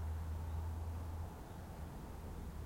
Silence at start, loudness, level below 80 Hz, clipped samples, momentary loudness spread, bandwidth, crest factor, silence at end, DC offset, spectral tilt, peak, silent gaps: 0 s; -47 LUFS; -50 dBFS; under 0.1%; 6 LU; 16.5 kHz; 10 dB; 0 s; under 0.1%; -7 dB/octave; -34 dBFS; none